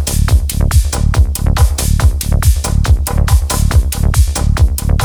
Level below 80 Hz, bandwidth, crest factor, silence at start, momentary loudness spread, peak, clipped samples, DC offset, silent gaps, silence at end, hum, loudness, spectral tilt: -12 dBFS; over 20 kHz; 10 dB; 0 s; 1 LU; 0 dBFS; under 0.1%; under 0.1%; none; 0 s; none; -13 LUFS; -5 dB/octave